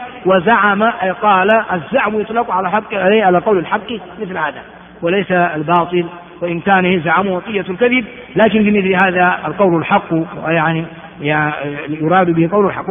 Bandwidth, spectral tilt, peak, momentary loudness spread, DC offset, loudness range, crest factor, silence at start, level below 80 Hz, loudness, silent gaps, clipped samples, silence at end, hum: 3.7 kHz; -4.5 dB/octave; 0 dBFS; 10 LU; under 0.1%; 3 LU; 14 dB; 0 s; -50 dBFS; -14 LUFS; none; under 0.1%; 0 s; none